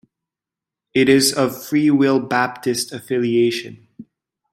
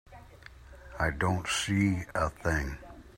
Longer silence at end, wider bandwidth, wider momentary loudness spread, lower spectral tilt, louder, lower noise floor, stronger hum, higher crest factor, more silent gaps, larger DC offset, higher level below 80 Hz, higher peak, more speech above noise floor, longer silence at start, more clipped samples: first, 0.5 s vs 0.05 s; about the same, 16.5 kHz vs 16 kHz; second, 9 LU vs 20 LU; about the same, -4 dB/octave vs -5 dB/octave; first, -18 LUFS vs -30 LUFS; first, -87 dBFS vs -51 dBFS; neither; about the same, 18 dB vs 18 dB; neither; neither; second, -62 dBFS vs -46 dBFS; first, -2 dBFS vs -14 dBFS; first, 70 dB vs 22 dB; first, 0.95 s vs 0.1 s; neither